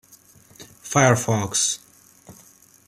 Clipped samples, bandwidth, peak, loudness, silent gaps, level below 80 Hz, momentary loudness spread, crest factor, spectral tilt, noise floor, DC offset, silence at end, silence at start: under 0.1%; 16 kHz; -2 dBFS; -20 LUFS; none; -58 dBFS; 12 LU; 22 dB; -3.5 dB/octave; -52 dBFS; under 0.1%; 0.55 s; 0.6 s